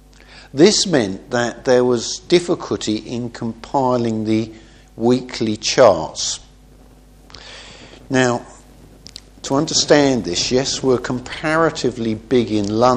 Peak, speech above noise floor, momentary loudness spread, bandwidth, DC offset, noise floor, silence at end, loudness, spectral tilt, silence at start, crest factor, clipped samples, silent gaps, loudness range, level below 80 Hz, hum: 0 dBFS; 28 dB; 16 LU; 10.5 kHz; under 0.1%; -45 dBFS; 0 s; -18 LUFS; -4 dB/octave; 0.3 s; 18 dB; under 0.1%; none; 5 LU; -46 dBFS; none